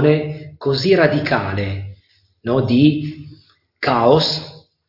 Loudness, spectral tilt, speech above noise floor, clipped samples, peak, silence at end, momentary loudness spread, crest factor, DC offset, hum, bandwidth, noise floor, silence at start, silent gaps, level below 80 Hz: -17 LUFS; -7 dB/octave; 39 dB; under 0.1%; 0 dBFS; 0.3 s; 16 LU; 18 dB; under 0.1%; none; 5.8 kHz; -55 dBFS; 0 s; none; -52 dBFS